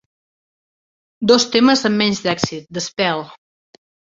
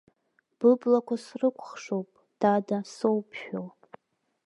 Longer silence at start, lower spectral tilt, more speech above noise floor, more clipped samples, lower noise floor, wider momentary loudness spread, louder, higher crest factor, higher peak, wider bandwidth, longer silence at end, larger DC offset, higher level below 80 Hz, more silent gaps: first, 1.2 s vs 0.6 s; second, -4 dB/octave vs -7 dB/octave; first, over 73 dB vs 49 dB; neither; first, under -90 dBFS vs -75 dBFS; about the same, 12 LU vs 14 LU; first, -17 LUFS vs -28 LUFS; about the same, 18 dB vs 18 dB; first, 0 dBFS vs -10 dBFS; second, 7.8 kHz vs 11 kHz; about the same, 0.85 s vs 0.75 s; neither; first, -58 dBFS vs -80 dBFS; neither